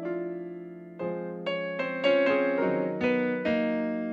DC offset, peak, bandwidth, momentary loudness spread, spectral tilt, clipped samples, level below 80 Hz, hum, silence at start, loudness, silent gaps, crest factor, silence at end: under 0.1%; -12 dBFS; 7.4 kHz; 13 LU; -7.5 dB/octave; under 0.1%; -68 dBFS; none; 0 s; -28 LUFS; none; 16 dB; 0 s